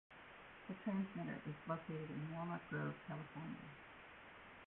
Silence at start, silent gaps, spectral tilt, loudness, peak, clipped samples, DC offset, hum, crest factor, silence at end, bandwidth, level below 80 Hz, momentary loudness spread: 0.1 s; none; -6.5 dB/octave; -48 LUFS; -30 dBFS; under 0.1%; under 0.1%; none; 18 dB; 0 s; 4 kHz; -76 dBFS; 14 LU